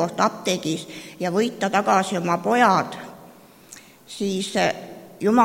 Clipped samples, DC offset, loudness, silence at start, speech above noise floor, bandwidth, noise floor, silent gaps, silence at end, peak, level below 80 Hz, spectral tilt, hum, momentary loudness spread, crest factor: under 0.1%; under 0.1%; -22 LUFS; 0 s; 25 dB; 17 kHz; -47 dBFS; none; 0 s; -4 dBFS; -64 dBFS; -4.5 dB/octave; none; 19 LU; 20 dB